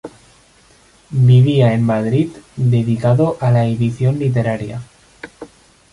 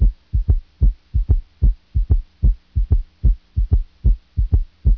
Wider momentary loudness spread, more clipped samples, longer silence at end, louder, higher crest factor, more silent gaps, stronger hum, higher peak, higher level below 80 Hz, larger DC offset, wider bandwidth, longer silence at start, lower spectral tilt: first, 20 LU vs 4 LU; neither; first, 0.45 s vs 0 s; first, -15 LUFS vs -22 LUFS; about the same, 14 dB vs 14 dB; neither; neither; about the same, -2 dBFS vs -4 dBFS; second, -48 dBFS vs -18 dBFS; neither; first, 11 kHz vs 1.2 kHz; about the same, 0.05 s vs 0 s; second, -8.5 dB/octave vs -11.5 dB/octave